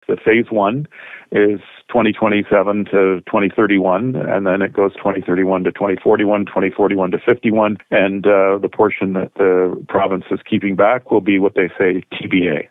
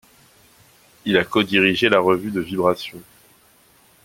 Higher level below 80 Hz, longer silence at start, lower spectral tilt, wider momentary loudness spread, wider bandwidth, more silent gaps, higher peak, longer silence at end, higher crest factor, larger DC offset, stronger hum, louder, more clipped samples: about the same, -56 dBFS vs -58 dBFS; second, 0.1 s vs 1.05 s; first, -9.5 dB/octave vs -5.5 dB/octave; second, 5 LU vs 12 LU; second, 4 kHz vs 16.5 kHz; neither; about the same, -2 dBFS vs 0 dBFS; second, 0.05 s vs 1.05 s; second, 14 dB vs 20 dB; neither; neither; first, -16 LUFS vs -19 LUFS; neither